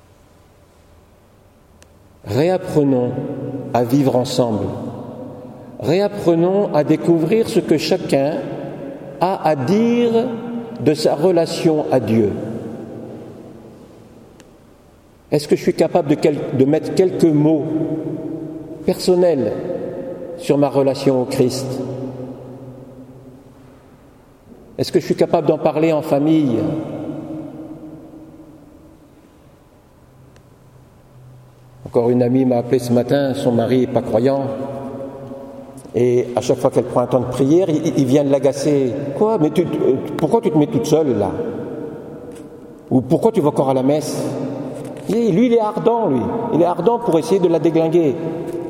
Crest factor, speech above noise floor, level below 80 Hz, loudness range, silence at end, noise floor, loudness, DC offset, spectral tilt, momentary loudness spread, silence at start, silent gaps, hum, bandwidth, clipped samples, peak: 18 dB; 33 dB; -54 dBFS; 6 LU; 0 s; -49 dBFS; -17 LUFS; under 0.1%; -7 dB/octave; 17 LU; 2.25 s; none; none; 16 kHz; under 0.1%; 0 dBFS